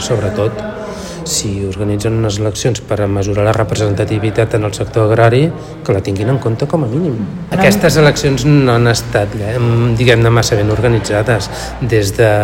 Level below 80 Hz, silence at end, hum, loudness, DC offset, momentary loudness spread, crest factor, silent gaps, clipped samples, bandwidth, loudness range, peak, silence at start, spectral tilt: -32 dBFS; 0 s; none; -13 LUFS; under 0.1%; 9 LU; 12 dB; none; under 0.1%; 16.5 kHz; 4 LU; 0 dBFS; 0 s; -5.5 dB/octave